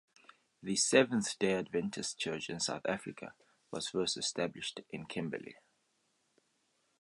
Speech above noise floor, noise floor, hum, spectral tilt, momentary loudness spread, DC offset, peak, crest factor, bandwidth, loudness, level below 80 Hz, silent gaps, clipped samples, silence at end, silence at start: 42 dB; -77 dBFS; none; -3 dB/octave; 18 LU; under 0.1%; -12 dBFS; 24 dB; 11.5 kHz; -35 LUFS; -74 dBFS; none; under 0.1%; 1.45 s; 0.6 s